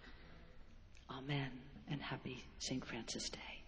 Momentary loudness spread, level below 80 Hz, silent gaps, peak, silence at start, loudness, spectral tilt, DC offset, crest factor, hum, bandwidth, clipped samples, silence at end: 19 LU; -62 dBFS; none; -28 dBFS; 0 s; -46 LUFS; -4 dB/octave; under 0.1%; 18 dB; none; 8 kHz; under 0.1%; 0 s